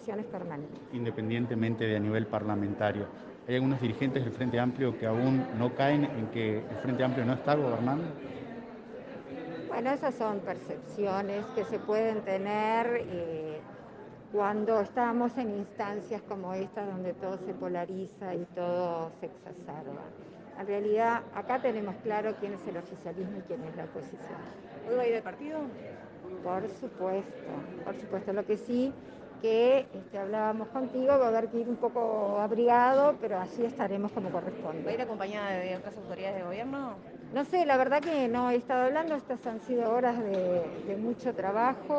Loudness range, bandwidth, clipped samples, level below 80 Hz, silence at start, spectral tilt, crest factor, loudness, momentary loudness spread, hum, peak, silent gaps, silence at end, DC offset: 8 LU; 8.2 kHz; under 0.1%; -70 dBFS; 0 s; -8 dB/octave; 20 dB; -32 LUFS; 14 LU; none; -12 dBFS; none; 0 s; under 0.1%